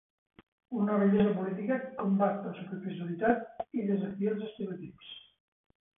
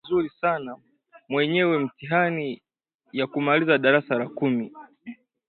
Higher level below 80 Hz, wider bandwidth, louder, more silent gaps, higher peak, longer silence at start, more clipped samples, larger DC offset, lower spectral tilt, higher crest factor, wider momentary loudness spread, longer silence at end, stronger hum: about the same, -70 dBFS vs -66 dBFS; second, 3.8 kHz vs 4.5 kHz; second, -32 LUFS vs -24 LUFS; second, none vs 2.95-2.99 s; second, -14 dBFS vs -6 dBFS; first, 0.7 s vs 0.05 s; neither; neither; about the same, -11 dB/octave vs -10.5 dB/octave; about the same, 20 dB vs 20 dB; second, 14 LU vs 20 LU; first, 0.8 s vs 0.35 s; neither